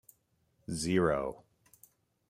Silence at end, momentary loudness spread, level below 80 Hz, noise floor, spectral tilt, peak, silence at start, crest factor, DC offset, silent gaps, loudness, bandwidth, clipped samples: 0.95 s; 22 LU; -60 dBFS; -74 dBFS; -5.5 dB/octave; -14 dBFS; 0.7 s; 22 dB; under 0.1%; none; -32 LUFS; 15.5 kHz; under 0.1%